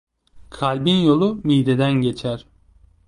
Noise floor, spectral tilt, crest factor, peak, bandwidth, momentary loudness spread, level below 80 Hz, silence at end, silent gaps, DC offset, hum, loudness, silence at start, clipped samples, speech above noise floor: -53 dBFS; -7.5 dB/octave; 16 dB; -4 dBFS; 11 kHz; 11 LU; -50 dBFS; 0.7 s; none; under 0.1%; none; -19 LUFS; 0.35 s; under 0.1%; 35 dB